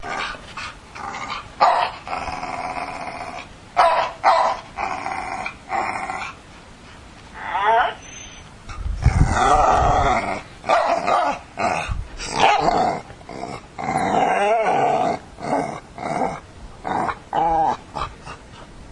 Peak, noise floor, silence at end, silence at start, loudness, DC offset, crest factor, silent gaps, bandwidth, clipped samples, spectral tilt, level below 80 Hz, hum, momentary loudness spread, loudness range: -2 dBFS; -42 dBFS; 0 s; 0 s; -21 LUFS; under 0.1%; 20 dB; none; 11 kHz; under 0.1%; -5 dB/octave; -34 dBFS; none; 18 LU; 6 LU